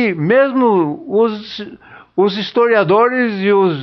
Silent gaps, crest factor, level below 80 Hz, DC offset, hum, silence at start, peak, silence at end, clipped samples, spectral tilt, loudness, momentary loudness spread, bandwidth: none; 12 dB; -60 dBFS; under 0.1%; none; 0 s; -2 dBFS; 0 s; under 0.1%; -8 dB/octave; -14 LUFS; 14 LU; 6.2 kHz